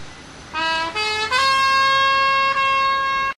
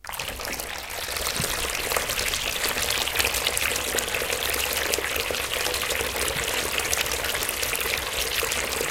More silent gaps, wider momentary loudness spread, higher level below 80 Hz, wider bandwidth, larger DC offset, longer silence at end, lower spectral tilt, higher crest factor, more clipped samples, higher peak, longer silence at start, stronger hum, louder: neither; about the same, 6 LU vs 5 LU; second, -50 dBFS vs -42 dBFS; second, 13 kHz vs 17 kHz; neither; about the same, 0.05 s vs 0 s; about the same, -1 dB/octave vs -1 dB/octave; second, 14 dB vs 26 dB; neither; second, -6 dBFS vs 0 dBFS; about the same, 0 s vs 0.05 s; neither; first, -17 LUFS vs -24 LUFS